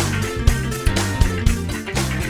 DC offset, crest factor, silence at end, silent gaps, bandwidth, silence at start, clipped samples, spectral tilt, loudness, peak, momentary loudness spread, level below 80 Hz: under 0.1%; 20 dB; 0 s; none; over 20 kHz; 0 s; under 0.1%; -5 dB/octave; -21 LUFS; 0 dBFS; 4 LU; -24 dBFS